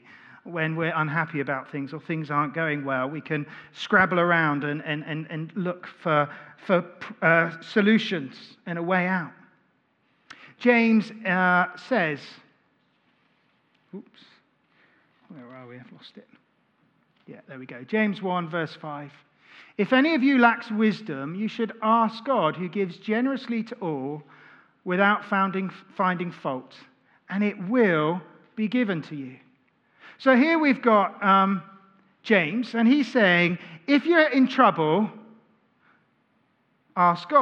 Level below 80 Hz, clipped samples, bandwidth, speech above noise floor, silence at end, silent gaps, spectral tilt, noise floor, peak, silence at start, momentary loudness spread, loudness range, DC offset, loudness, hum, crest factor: -76 dBFS; under 0.1%; 7.4 kHz; 44 dB; 0 s; none; -7.5 dB/octave; -68 dBFS; -2 dBFS; 0.45 s; 19 LU; 6 LU; under 0.1%; -24 LUFS; none; 22 dB